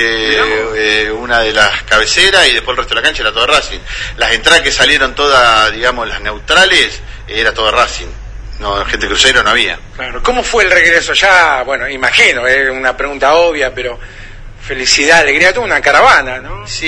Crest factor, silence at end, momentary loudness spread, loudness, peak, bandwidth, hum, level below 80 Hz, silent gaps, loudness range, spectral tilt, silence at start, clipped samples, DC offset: 12 dB; 0 s; 14 LU; -9 LUFS; 0 dBFS; 11 kHz; none; -28 dBFS; none; 3 LU; -1.5 dB/octave; 0 s; 0.6%; under 0.1%